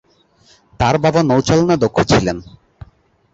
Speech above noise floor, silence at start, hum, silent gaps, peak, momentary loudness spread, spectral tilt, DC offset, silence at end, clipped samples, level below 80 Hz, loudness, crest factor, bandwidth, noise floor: 39 dB; 0.8 s; none; none; -2 dBFS; 6 LU; -6 dB/octave; under 0.1%; 0.9 s; under 0.1%; -38 dBFS; -15 LUFS; 16 dB; 8 kHz; -53 dBFS